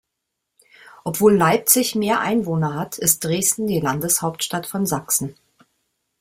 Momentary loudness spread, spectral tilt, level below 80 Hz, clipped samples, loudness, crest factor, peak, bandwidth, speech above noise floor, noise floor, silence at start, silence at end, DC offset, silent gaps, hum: 9 LU; -4 dB/octave; -56 dBFS; under 0.1%; -19 LUFS; 22 dB; 0 dBFS; 16.5 kHz; 59 dB; -79 dBFS; 1.05 s; 0.9 s; under 0.1%; none; none